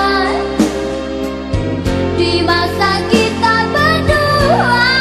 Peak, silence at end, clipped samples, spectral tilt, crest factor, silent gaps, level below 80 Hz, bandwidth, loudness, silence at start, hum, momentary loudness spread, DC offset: 0 dBFS; 0 s; under 0.1%; -5 dB/octave; 12 dB; none; -30 dBFS; 14 kHz; -13 LUFS; 0 s; none; 8 LU; under 0.1%